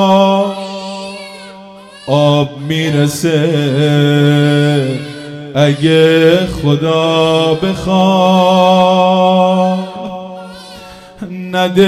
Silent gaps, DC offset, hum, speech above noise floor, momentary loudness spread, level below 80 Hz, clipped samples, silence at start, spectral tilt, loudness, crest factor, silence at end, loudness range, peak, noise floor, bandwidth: none; under 0.1%; none; 24 dB; 19 LU; -42 dBFS; 0.3%; 0 s; -6.5 dB/octave; -11 LUFS; 12 dB; 0 s; 4 LU; 0 dBFS; -34 dBFS; 14.5 kHz